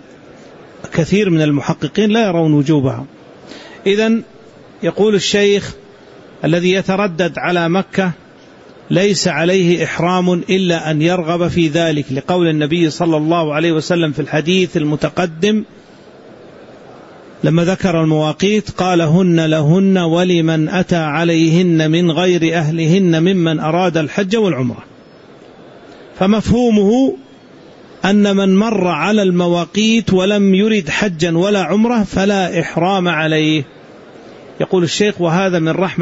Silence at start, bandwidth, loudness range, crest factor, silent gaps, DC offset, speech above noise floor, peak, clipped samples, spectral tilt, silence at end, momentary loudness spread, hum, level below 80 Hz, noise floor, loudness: 0.3 s; 8 kHz; 4 LU; 12 dB; none; under 0.1%; 27 dB; -2 dBFS; under 0.1%; -6 dB/octave; 0 s; 6 LU; none; -46 dBFS; -40 dBFS; -14 LUFS